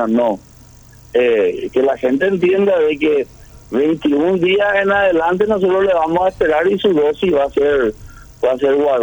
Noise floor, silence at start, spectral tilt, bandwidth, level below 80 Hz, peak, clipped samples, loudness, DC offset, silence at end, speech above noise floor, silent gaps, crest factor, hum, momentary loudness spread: -42 dBFS; 0 s; -6.5 dB/octave; over 20 kHz; -44 dBFS; -2 dBFS; under 0.1%; -15 LUFS; under 0.1%; 0 s; 28 dB; none; 12 dB; none; 5 LU